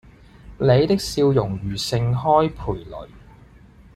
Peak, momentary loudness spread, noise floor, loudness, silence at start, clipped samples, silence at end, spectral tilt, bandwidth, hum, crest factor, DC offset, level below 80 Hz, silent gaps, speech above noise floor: -4 dBFS; 13 LU; -48 dBFS; -20 LUFS; 0.45 s; under 0.1%; 0.75 s; -6.5 dB/octave; 14 kHz; none; 18 dB; under 0.1%; -42 dBFS; none; 28 dB